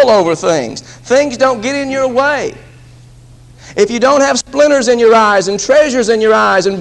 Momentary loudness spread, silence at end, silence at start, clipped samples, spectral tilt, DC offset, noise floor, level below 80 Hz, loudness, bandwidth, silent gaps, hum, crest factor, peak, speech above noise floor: 8 LU; 0 s; 0 s; under 0.1%; -3.5 dB/octave; under 0.1%; -38 dBFS; -44 dBFS; -11 LUFS; 11 kHz; none; none; 12 dB; 0 dBFS; 28 dB